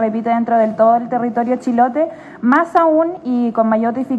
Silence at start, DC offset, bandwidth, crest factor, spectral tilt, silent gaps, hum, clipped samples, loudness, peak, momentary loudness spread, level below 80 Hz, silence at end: 0 s; under 0.1%; 8.4 kHz; 14 dB; -8 dB/octave; none; none; under 0.1%; -15 LUFS; 0 dBFS; 6 LU; -62 dBFS; 0 s